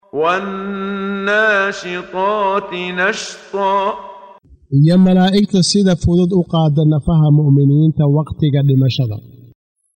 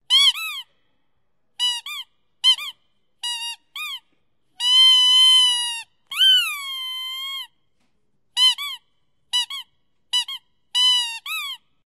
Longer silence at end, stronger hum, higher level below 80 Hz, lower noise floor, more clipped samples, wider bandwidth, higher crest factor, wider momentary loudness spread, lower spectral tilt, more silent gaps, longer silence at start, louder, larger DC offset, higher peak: first, 0.75 s vs 0.3 s; neither; first, -40 dBFS vs -78 dBFS; second, -42 dBFS vs -75 dBFS; neither; second, 9.4 kHz vs 16 kHz; about the same, 12 dB vs 16 dB; second, 11 LU vs 21 LU; first, -6.5 dB/octave vs 6.5 dB/octave; neither; about the same, 0.15 s vs 0.1 s; about the same, -15 LUFS vs -17 LUFS; neither; first, -2 dBFS vs -6 dBFS